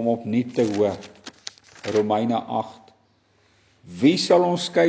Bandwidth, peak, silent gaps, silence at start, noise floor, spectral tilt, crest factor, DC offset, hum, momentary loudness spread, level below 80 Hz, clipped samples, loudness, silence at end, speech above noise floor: 8 kHz; -4 dBFS; none; 0 s; -62 dBFS; -5.5 dB/octave; 20 dB; under 0.1%; none; 20 LU; -62 dBFS; under 0.1%; -22 LUFS; 0 s; 41 dB